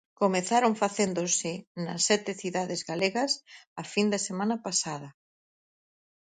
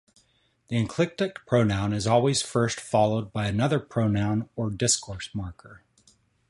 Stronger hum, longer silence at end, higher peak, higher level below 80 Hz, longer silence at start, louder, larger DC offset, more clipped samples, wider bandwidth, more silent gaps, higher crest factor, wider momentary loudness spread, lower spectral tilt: neither; first, 1.2 s vs 0.7 s; about the same, -10 dBFS vs -8 dBFS; second, -74 dBFS vs -50 dBFS; second, 0.2 s vs 0.7 s; about the same, -28 LUFS vs -26 LUFS; neither; neither; second, 9.6 kHz vs 11.5 kHz; first, 1.67-1.75 s, 3.67-3.76 s vs none; about the same, 20 dB vs 20 dB; about the same, 11 LU vs 9 LU; second, -3 dB/octave vs -5 dB/octave